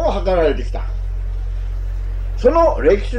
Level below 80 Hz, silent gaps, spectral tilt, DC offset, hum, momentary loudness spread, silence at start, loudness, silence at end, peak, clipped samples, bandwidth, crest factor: -22 dBFS; none; -7.5 dB/octave; under 0.1%; none; 12 LU; 0 s; -19 LUFS; 0 s; -2 dBFS; under 0.1%; 6.6 kHz; 16 dB